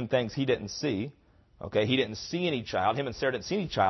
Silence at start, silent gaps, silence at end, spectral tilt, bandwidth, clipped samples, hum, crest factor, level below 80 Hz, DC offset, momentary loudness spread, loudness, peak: 0 s; none; 0 s; -5.5 dB/octave; 6.2 kHz; under 0.1%; none; 18 dB; -58 dBFS; under 0.1%; 5 LU; -30 LUFS; -12 dBFS